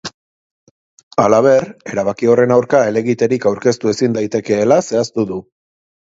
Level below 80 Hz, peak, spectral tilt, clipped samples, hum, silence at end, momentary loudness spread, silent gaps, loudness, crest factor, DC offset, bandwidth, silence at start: -54 dBFS; 0 dBFS; -6 dB/octave; under 0.1%; none; 0.7 s; 10 LU; 0.14-1.11 s; -15 LUFS; 16 dB; under 0.1%; 8 kHz; 0.05 s